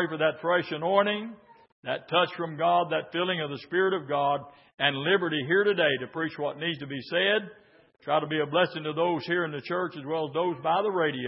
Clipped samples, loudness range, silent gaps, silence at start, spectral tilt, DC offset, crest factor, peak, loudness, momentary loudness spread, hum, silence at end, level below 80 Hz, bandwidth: under 0.1%; 2 LU; 1.72-1.83 s, 4.74-4.78 s; 0 s; -9 dB/octave; under 0.1%; 20 dB; -8 dBFS; -27 LUFS; 8 LU; none; 0 s; -76 dBFS; 5.8 kHz